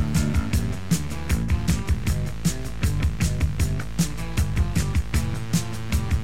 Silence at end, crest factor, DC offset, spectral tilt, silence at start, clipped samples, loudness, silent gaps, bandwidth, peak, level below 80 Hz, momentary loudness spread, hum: 0 s; 14 dB; 3%; -5.5 dB/octave; 0 s; under 0.1%; -25 LUFS; none; 16 kHz; -8 dBFS; -28 dBFS; 3 LU; none